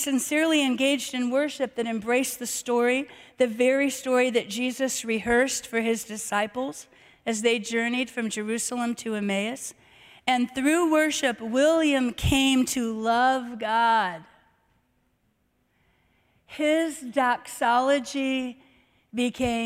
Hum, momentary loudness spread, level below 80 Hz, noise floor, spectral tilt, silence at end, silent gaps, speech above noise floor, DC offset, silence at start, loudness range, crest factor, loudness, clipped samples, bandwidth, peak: none; 8 LU; -52 dBFS; -70 dBFS; -3.5 dB/octave; 0 s; none; 45 dB; under 0.1%; 0 s; 5 LU; 18 dB; -25 LUFS; under 0.1%; 16 kHz; -8 dBFS